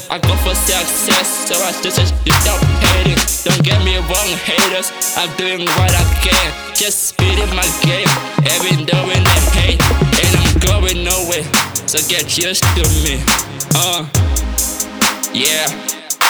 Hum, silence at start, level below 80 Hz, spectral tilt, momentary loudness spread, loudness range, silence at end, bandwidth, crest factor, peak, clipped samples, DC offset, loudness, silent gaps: none; 0 s; -22 dBFS; -3 dB/octave; 4 LU; 2 LU; 0 s; over 20 kHz; 14 dB; 0 dBFS; under 0.1%; under 0.1%; -13 LUFS; none